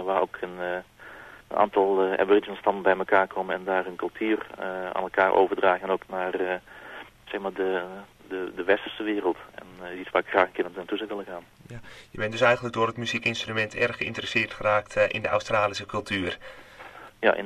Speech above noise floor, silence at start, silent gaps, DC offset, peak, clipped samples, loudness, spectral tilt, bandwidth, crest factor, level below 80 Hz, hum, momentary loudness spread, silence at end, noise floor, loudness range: 19 dB; 0 s; none; under 0.1%; -4 dBFS; under 0.1%; -26 LUFS; -5 dB/octave; 13.5 kHz; 22 dB; -58 dBFS; none; 20 LU; 0 s; -46 dBFS; 5 LU